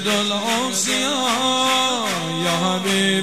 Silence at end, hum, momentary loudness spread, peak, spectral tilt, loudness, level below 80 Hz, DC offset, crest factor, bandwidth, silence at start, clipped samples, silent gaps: 0 s; none; 4 LU; -6 dBFS; -2.5 dB/octave; -19 LUFS; -64 dBFS; 0.5%; 14 dB; 16 kHz; 0 s; under 0.1%; none